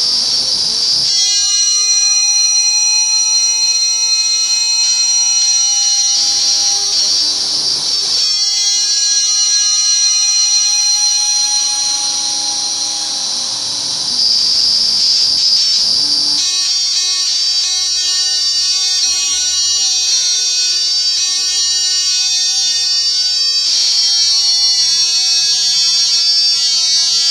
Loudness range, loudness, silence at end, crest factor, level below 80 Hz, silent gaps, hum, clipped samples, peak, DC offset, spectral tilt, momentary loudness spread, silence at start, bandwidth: 2 LU; -10 LUFS; 0 s; 12 dB; -56 dBFS; none; none; under 0.1%; 0 dBFS; under 0.1%; 3.5 dB/octave; 3 LU; 0 s; 16 kHz